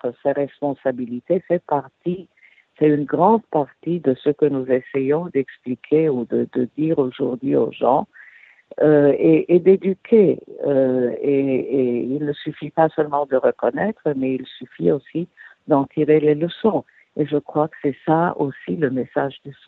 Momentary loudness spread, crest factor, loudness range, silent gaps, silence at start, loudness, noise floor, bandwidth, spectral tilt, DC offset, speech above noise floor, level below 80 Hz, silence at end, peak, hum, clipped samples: 11 LU; 16 dB; 4 LU; none; 0.05 s; -20 LUFS; -48 dBFS; 4.2 kHz; -10.5 dB/octave; under 0.1%; 28 dB; -66 dBFS; 0.15 s; -2 dBFS; none; under 0.1%